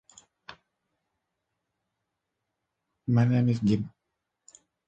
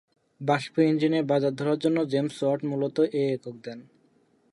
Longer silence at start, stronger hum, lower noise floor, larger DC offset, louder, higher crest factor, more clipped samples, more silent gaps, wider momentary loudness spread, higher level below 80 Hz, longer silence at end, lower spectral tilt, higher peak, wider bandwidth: about the same, 0.5 s vs 0.4 s; neither; first, -83 dBFS vs -64 dBFS; neither; about the same, -26 LUFS vs -26 LUFS; about the same, 20 dB vs 16 dB; neither; neither; first, 15 LU vs 12 LU; first, -62 dBFS vs -74 dBFS; first, 1 s vs 0.7 s; first, -8.5 dB/octave vs -7 dB/octave; about the same, -12 dBFS vs -10 dBFS; second, 8 kHz vs 11.5 kHz